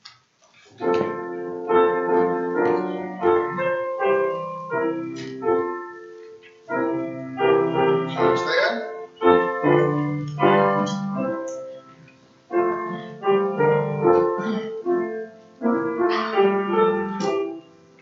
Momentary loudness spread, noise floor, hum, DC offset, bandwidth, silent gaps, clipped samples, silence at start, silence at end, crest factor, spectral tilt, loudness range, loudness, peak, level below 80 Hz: 12 LU; -56 dBFS; none; under 0.1%; 7.4 kHz; none; under 0.1%; 0.05 s; 0.4 s; 20 dB; -7 dB/octave; 4 LU; -22 LUFS; -2 dBFS; -66 dBFS